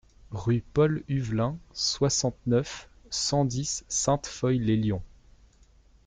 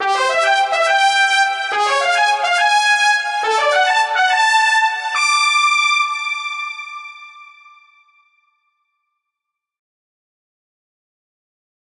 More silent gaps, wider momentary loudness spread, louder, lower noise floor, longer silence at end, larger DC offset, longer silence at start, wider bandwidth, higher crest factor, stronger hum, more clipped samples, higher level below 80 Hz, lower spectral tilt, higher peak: neither; about the same, 8 LU vs 9 LU; second, -27 LUFS vs -14 LUFS; second, -58 dBFS vs -82 dBFS; second, 1 s vs 4.55 s; neither; first, 0.3 s vs 0 s; second, 9.6 kHz vs 11.5 kHz; about the same, 16 dB vs 14 dB; neither; neither; first, -50 dBFS vs -74 dBFS; first, -5 dB/octave vs 2.5 dB/octave; second, -12 dBFS vs -4 dBFS